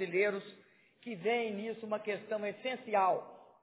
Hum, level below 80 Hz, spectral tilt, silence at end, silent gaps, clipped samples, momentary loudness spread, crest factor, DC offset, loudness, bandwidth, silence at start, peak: none; under -90 dBFS; -3 dB/octave; 0.2 s; none; under 0.1%; 15 LU; 18 dB; under 0.1%; -35 LUFS; 4 kHz; 0 s; -18 dBFS